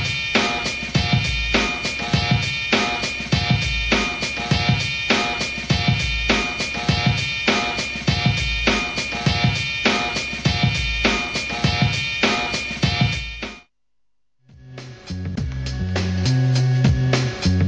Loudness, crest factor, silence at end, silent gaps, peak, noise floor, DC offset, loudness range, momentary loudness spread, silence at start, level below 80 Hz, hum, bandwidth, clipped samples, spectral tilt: -20 LUFS; 20 dB; 0 s; none; 0 dBFS; -76 dBFS; under 0.1%; 5 LU; 5 LU; 0 s; -34 dBFS; none; 9.4 kHz; under 0.1%; -4.5 dB/octave